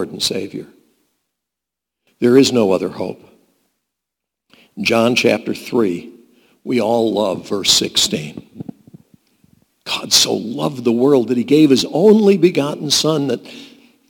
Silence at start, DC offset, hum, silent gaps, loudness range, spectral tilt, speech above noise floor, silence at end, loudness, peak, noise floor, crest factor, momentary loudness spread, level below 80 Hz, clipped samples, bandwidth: 0 s; under 0.1%; none; none; 6 LU; -4 dB/octave; 68 dB; 0.45 s; -15 LUFS; 0 dBFS; -83 dBFS; 18 dB; 17 LU; -58 dBFS; under 0.1%; 19 kHz